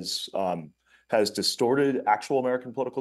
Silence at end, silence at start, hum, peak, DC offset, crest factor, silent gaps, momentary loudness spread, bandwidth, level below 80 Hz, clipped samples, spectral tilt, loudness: 0 s; 0 s; none; -10 dBFS; under 0.1%; 18 dB; none; 7 LU; 12.5 kHz; -74 dBFS; under 0.1%; -4 dB/octave; -26 LUFS